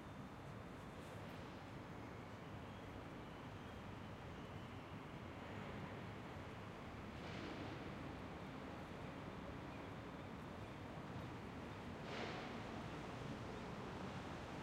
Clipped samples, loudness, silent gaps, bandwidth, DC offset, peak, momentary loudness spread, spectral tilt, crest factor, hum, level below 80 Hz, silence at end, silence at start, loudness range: under 0.1%; -52 LUFS; none; 16 kHz; under 0.1%; -36 dBFS; 4 LU; -6 dB/octave; 16 dB; none; -66 dBFS; 0 s; 0 s; 3 LU